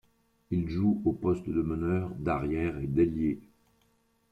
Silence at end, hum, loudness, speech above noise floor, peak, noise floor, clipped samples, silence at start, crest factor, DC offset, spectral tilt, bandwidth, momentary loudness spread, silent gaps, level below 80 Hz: 0.9 s; none; -30 LUFS; 41 dB; -14 dBFS; -70 dBFS; under 0.1%; 0.5 s; 16 dB; under 0.1%; -10 dB/octave; 8.2 kHz; 5 LU; none; -50 dBFS